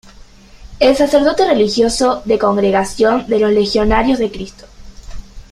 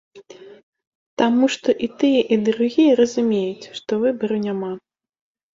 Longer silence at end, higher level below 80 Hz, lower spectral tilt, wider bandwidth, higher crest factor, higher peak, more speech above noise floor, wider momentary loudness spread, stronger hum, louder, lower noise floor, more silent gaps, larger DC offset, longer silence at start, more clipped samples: second, 0.1 s vs 0.8 s; first, -32 dBFS vs -64 dBFS; about the same, -4.5 dB/octave vs -5.5 dB/octave; first, 14 kHz vs 7.6 kHz; about the same, 14 dB vs 16 dB; first, 0 dBFS vs -4 dBFS; about the same, 27 dB vs 24 dB; second, 4 LU vs 12 LU; neither; first, -14 LUFS vs -19 LUFS; about the same, -40 dBFS vs -43 dBFS; second, none vs 0.63-0.73 s, 0.87-1.17 s; neither; about the same, 0.05 s vs 0.15 s; neither